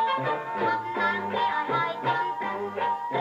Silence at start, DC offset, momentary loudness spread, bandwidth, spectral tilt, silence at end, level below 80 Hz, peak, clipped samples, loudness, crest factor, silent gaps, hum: 0 s; under 0.1%; 3 LU; 8 kHz; -6 dB/octave; 0 s; -72 dBFS; -14 dBFS; under 0.1%; -27 LUFS; 14 dB; none; none